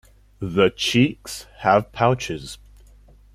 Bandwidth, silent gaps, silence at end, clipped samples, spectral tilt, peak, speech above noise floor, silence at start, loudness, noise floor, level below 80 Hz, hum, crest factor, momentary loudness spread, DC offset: 15.5 kHz; none; 0.8 s; under 0.1%; -5 dB/octave; -2 dBFS; 29 dB; 0.4 s; -20 LUFS; -49 dBFS; -48 dBFS; none; 20 dB; 16 LU; under 0.1%